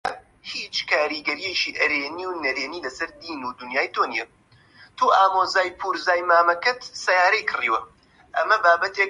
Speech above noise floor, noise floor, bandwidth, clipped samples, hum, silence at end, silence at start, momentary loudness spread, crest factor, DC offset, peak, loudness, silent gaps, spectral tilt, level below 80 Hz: 30 dB; -52 dBFS; 11.5 kHz; under 0.1%; none; 0 s; 0.05 s; 14 LU; 18 dB; under 0.1%; -4 dBFS; -22 LUFS; none; -1.5 dB/octave; -64 dBFS